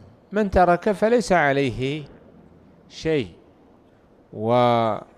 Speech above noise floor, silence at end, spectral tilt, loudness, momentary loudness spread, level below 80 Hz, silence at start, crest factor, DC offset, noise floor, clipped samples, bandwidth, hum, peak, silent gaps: 34 dB; 0.15 s; -6 dB/octave; -21 LUFS; 14 LU; -44 dBFS; 0.3 s; 16 dB; under 0.1%; -54 dBFS; under 0.1%; 13 kHz; none; -6 dBFS; none